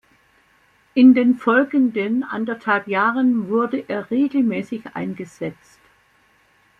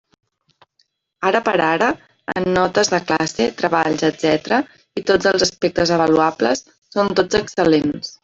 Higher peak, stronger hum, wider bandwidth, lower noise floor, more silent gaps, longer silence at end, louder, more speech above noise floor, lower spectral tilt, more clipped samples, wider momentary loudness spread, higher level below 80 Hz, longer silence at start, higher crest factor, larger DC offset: about the same, -2 dBFS vs 0 dBFS; neither; second, 7 kHz vs 8 kHz; second, -58 dBFS vs -65 dBFS; second, none vs 6.78-6.82 s; first, 1.25 s vs 0.15 s; about the same, -19 LUFS vs -18 LUFS; second, 40 dB vs 47 dB; first, -7.5 dB/octave vs -4 dB/octave; neither; first, 16 LU vs 7 LU; second, -66 dBFS vs -50 dBFS; second, 0.95 s vs 1.2 s; about the same, 18 dB vs 18 dB; neither